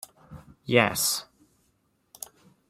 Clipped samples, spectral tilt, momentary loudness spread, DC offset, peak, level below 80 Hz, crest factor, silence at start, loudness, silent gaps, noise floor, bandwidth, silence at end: under 0.1%; -3 dB/octave; 21 LU; under 0.1%; -4 dBFS; -62 dBFS; 26 dB; 0.3 s; -24 LUFS; none; -70 dBFS; 16 kHz; 1.45 s